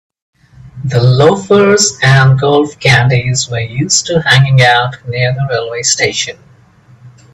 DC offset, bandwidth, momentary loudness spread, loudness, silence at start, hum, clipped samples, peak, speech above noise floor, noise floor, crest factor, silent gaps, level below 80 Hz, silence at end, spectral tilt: under 0.1%; 10.5 kHz; 9 LU; -10 LUFS; 0.65 s; none; under 0.1%; 0 dBFS; 33 dB; -43 dBFS; 12 dB; none; -42 dBFS; 0.25 s; -4 dB/octave